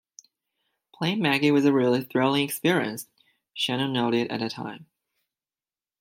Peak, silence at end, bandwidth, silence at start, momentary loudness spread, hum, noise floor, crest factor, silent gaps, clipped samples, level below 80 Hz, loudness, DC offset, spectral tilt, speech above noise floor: -6 dBFS; 1.2 s; 16.5 kHz; 1 s; 16 LU; none; under -90 dBFS; 20 dB; none; under 0.1%; -72 dBFS; -24 LUFS; under 0.1%; -5 dB/octave; over 66 dB